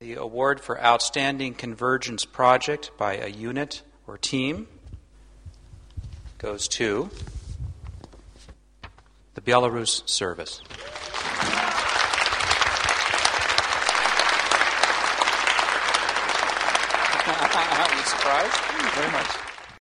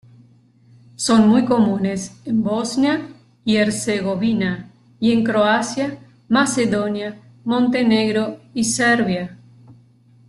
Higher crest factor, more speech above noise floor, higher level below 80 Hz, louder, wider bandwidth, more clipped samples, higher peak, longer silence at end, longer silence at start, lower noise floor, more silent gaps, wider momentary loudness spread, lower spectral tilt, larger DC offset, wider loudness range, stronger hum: first, 24 dB vs 16 dB; second, 27 dB vs 34 dB; first, -48 dBFS vs -56 dBFS; second, -22 LUFS vs -19 LUFS; first, 14 kHz vs 12.5 kHz; neither; first, 0 dBFS vs -4 dBFS; second, 0 s vs 0.55 s; second, 0 s vs 1 s; about the same, -53 dBFS vs -52 dBFS; neither; first, 17 LU vs 12 LU; second, -2 dB/octave vs -4.5 dB/octave; neither; first, 11 LU vs 2 LU; neither